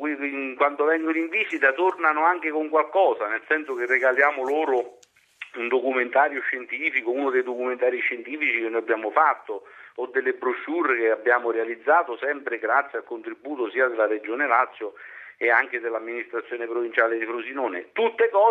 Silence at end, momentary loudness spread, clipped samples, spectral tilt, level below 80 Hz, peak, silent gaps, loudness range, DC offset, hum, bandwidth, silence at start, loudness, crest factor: 0 s; 10 LU; under 0.1%; -4 dB/octave; -84 dBFS; -4 dBFS; none; 3 LU; under 0.1%; none; 8 kHz; 0 s; -23 LUFS; 20 dB